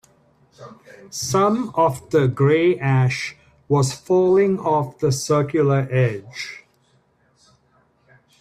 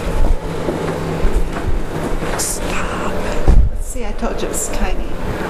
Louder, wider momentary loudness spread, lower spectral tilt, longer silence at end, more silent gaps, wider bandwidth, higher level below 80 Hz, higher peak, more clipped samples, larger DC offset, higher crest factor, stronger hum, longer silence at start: about the same, -19 LUFS vs -21 LUFS; first, 14 LU vs 6 LU; about the same, -6 dB/octave vs -5 dB/octave; first, 1.85 s vs 0 s; neither; about the same, 14.5 kHz vs 15 kHz; second, -56 dBFS vs -18 dBFS; second, -6 dBFS vs 0 dBFS; neither; neither; about the same, 16 dB vs 16 dB; neither; first, 0.6 s vs 0 s